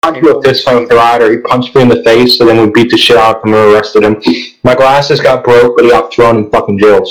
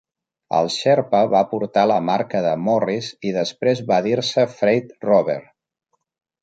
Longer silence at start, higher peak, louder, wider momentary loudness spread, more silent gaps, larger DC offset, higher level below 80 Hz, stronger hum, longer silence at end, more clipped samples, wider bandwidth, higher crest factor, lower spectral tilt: second, 0.05 s vs 0.5 s; about the same, 0 dBFS vs -2 dBFS; first, -6 LUFS vs -19 LUFS; about the same, 5 LU vs 6 LU; neither; neither; first, -38 dBFS vs -66 dBFS; neither; second, 0 s vs 1 s; first, 3% vs under 0.1%; first, 17.5 kHz vs 9.2 kHz; second, 6 dB vs 18 dB; about the same, -5.5 dB/octave vs -5.5 dB/octave